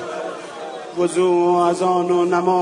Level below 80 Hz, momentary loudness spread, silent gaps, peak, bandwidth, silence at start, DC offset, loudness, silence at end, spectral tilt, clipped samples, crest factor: -70 dBFS; 15 LU; none; -4 dBFS; 11 kHz; 0 s; under 0.1%; -18 LUFS; 0 s; -6 dB/octave; under 0.1%; 14 dB